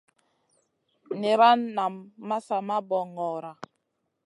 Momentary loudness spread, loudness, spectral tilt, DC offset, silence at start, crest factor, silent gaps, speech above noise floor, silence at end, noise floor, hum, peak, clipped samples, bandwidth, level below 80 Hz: 22 LU; -26 LUFS; -5.5 dB/octave; under 0.1%; 1.1 s; 20 dB; none; 52 dB; 0.6 s; -78 dBFS; none; -8 dBFS; under 0.1%; 11 kHz; -84 dBFS